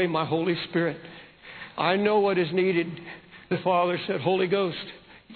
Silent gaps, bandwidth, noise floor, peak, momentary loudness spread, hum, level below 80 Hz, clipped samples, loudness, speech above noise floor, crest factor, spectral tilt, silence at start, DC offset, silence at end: none; 4.6 kHz; -45 dBFS; -8 dBFS; 19 LU; none; -66 dBFS; under 0.1%; -25 LUFS; 19 dB; 18 dB; -9.5 dB/octave; 0 s; under 0.1%; 0 s